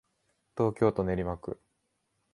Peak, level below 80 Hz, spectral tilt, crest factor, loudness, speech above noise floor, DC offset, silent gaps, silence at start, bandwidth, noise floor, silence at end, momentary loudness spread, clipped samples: -12 dBFS; -52 dBFS; -9 dB/octave; 22 dB; -30 LUFS; 49 dB; under 0.1%; none; 0.55 s; 11.5 kHz; -78 dBFS; 0.8 s; 16 LU; under 0.1%